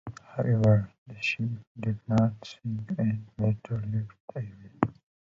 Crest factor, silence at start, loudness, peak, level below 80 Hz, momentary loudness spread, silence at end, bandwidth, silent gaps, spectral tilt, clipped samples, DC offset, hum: 22 dB; 0.05 s; -30 LUFS; -6 dBFS; -54 dBFS; 15 LU; 0.35 s; 7.4 kHz; 0.98-1.06 s, 1.67-1.75 s, 4.20-4.28 s; -8 dB/octave; under 0.1%; under 0.1%; none